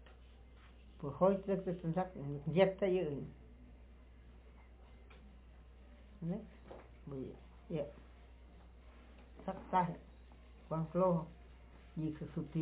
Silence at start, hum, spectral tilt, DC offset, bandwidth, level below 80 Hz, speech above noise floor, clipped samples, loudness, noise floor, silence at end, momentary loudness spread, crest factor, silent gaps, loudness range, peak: 0 s; none; -7 dB/octave; under 0.1%; 4 kHz; -58 dBFS; 22 dB; under 0.1%; -38 LUFS; -58 dBFS; 0 s; 27 LU; 24 dB; none; 15 LU; -16 dBFS